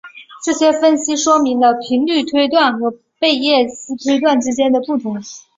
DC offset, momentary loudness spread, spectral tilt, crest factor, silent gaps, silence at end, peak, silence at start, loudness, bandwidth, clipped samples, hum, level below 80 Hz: under 0.1%; 9 LU; -2.5 dB/octave; 14 dB; none; 0.2 s; -2 dBFS; 0.05 s; -15 LUFS; 7.8 kHz; under 0.1%; none; -60 dBFS